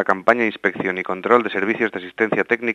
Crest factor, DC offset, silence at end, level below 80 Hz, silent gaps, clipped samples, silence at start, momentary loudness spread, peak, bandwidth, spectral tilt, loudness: 20 dB; under 0.1%; 0 s; -66 dBFS; none; under 0.1%; 0 s; 6 LU; 0 dBFS; 9.8 kHz; -6.5 dB/octave; -20 LUFS